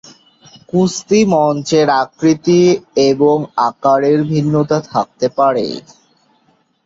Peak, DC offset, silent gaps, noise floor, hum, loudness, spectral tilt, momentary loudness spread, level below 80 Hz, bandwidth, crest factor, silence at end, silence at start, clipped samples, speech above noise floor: -2 dBFS; under 0.1%; none; -57 dBFS; none; -14 LUFS; -6 dB/octave; 7 LU; -54 dBFS; 7.8 kHz; 14 dB; 1.05 s; 0.75 s; under 0.1%; 44 dB